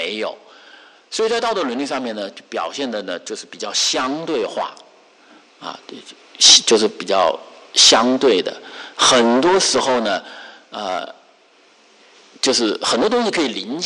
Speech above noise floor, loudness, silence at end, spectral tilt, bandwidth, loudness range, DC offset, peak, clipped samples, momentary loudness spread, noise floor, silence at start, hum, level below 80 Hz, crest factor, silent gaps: 34 dB; -16 LUFS; 0 s; -1 dB/octave; 11.5 kHz; 10 LU; under 0.1%; 0 dBFS; under 0.1%; 22 LU; -52 dBFS; 0 s; none; -60 dBFS; 18 dB; none